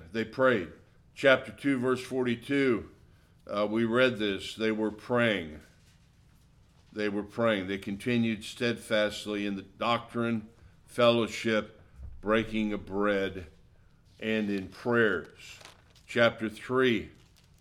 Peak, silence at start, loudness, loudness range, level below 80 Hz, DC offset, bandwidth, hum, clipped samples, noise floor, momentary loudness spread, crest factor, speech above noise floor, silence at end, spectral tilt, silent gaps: -8 dBFS; 0 s; -29 LUFS; 4 LU; -56 dBFS; under 0.1%; 14 kHz; none; under 0.1%; -60 dBFS; 12 LU; 22 dB; 31 dB; 0.5 s; -5.5 dB/octave; none